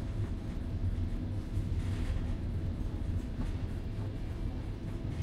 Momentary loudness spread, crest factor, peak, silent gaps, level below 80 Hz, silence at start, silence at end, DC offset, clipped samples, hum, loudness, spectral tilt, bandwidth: 4 LU; 12 dB; -22 dBFS; none; -38 dBFS; 0 s; 0 s; under 0.1%; under 0.1%; none; -38 LUFS; -8 dB/octave; 11.5 kHz